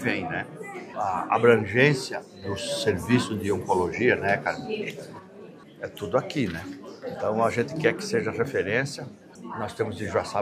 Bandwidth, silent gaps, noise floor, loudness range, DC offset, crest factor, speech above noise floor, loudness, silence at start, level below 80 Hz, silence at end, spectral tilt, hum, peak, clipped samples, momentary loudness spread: 15 kHz; none; -46 dBFS; 5 LU; under 0.1%; 22 dB; 20 dB; -26 LUFS; 0 s; -64 dBFS; 0 s; -5.5 dB/octave; none; -4 dBFS; under 0.1%; 18 LU